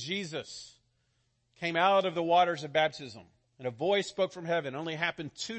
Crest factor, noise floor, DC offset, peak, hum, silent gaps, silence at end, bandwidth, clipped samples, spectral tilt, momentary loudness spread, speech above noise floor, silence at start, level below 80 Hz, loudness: 20 dB; -75 dBFS; under 0.1%; -12 dBFS; none; none; 0 s; 8.8 kHz; under 0.1%; -4 dB/octave; 14 LU; 44 dB; 0 s; -74 dBFS; -30 LUFS